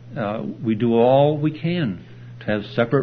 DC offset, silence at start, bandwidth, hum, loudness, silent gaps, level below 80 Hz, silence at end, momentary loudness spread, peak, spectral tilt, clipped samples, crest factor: under 0.1%; 0 s; 6 kHz; none; -21 LUFS; none; -58 dBFS; 0 s; 13 LU; -4 dBFS; -9.5 dB/octave; under 0.1%; 16 dB